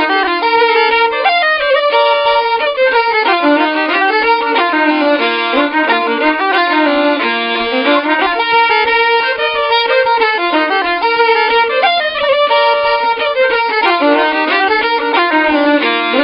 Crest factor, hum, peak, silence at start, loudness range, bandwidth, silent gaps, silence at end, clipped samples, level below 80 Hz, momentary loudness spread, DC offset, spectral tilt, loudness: 12 dB; none; 0 dBFS; 0 s; 1 LU; 5.6 kHz; none; 0 s; under 0.1%; -50 dBFS; 3 LU; under 0.1%; -5.5 dB/octave; -11 LUFS